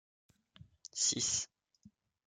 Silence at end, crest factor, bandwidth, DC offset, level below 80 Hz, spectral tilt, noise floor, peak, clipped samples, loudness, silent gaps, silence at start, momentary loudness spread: 0.4 s; 22 dB; 11 kHz; under 0.1%; -74 dBFS; -0.5 dB/octave; -66 dBFS; -20 dBFS; under 0.1%; -33 LUFS; none; 0.95 s; 17 LU